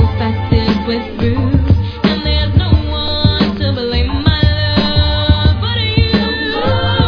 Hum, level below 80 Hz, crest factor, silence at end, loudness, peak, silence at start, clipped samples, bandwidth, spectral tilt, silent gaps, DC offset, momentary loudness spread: none; -20 dBFS; 12 dB; 0 s; -14 LUFS; 0 dBFS; 0 s; under 0.1%; 5.4 kHz; -8 dB/octave; none; under 0.1%; 4 LU